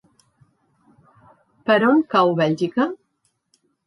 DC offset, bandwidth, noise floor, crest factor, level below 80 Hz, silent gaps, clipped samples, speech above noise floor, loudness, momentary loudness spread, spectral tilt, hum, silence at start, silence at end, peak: under 0.1%; 11 kHz; -70 dBFS; 18 dB; -70 dBFS; none; under 0.1%; 52 dB; -19 LUFS; 11 LU; -7 dB/octave; none; 1.65 s; 0.9 s; -6 dBFS